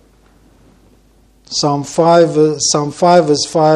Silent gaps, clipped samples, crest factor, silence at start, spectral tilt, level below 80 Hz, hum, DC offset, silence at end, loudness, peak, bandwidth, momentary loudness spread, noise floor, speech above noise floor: none; under 0.1%; 14 dB; 1.5 s; -4.5 dB/octave; -52 dBFS; none; under 0.1%; 0 s; -12 LUFS; 0 dBFS; 11.5 kHz; 6 LU; -50 dBFS; 38 dB